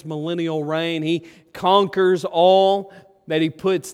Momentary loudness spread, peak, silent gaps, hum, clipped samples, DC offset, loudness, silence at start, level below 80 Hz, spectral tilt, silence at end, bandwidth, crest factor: 10 LU; -2 dBFS; none; none; under 0.1%; under 0.1%; -19 LUFS; 0.05 s; -66 dBFS; -5.5 dB/octave; 0 s; 14.5 kHz; 18 dB